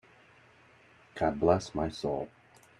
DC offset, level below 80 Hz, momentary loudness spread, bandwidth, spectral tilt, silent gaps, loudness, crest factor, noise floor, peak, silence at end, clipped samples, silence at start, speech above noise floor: under 0.1%; -56 dBFS; 15 LU; 11 kHz; -6.5 dB/octave; none; -31 LUFS; 24 dB; -60 dBFS; -8 dBFS; 0.5 s; under 0.1%; 1.15 s; 30 dB